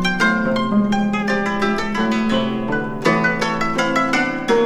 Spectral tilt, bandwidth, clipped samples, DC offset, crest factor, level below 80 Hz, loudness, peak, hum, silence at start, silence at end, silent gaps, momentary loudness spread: -5.5 dB/octave; 12 kHz; under 0.1%; under 0.1%; 14 dB; -40 dBFS; -18 LUFS; -4 dBFS; none; 0 s; 0 s; none; 3 LU